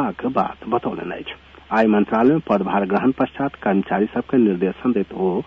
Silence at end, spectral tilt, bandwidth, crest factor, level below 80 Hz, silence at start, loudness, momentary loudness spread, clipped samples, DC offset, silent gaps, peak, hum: 0.05 s; -9 dB/octave; 6 kHz; 14 dB; -52 dBFS; 0 s; -20 LUFS; 10 LU; under 0.1%; under 0.1%; none; -6 dBFS; none